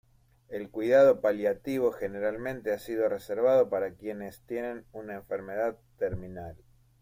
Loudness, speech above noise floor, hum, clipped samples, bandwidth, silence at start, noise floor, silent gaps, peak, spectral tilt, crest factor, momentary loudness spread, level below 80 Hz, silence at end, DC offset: -29 LUFS; 27 dB; none; under 0.1%; 16 kHz; 0.5 s; -56 dBFS; none; -12 dBFS; -6.5 dB/octave; 18 dB; 18 LU; -58 dBFS; 0.45 s; under 0.1%